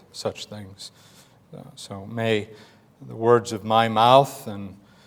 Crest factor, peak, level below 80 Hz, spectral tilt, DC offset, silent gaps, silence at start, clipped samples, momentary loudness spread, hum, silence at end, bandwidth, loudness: 22 dB; -2 dBFS; -68 dBFS; -5 dB/octave; under 0.1%; none; 0.15 s; under 0.1%; 25 LU; none; 0.35 s; 20 kHz; -21 LUFS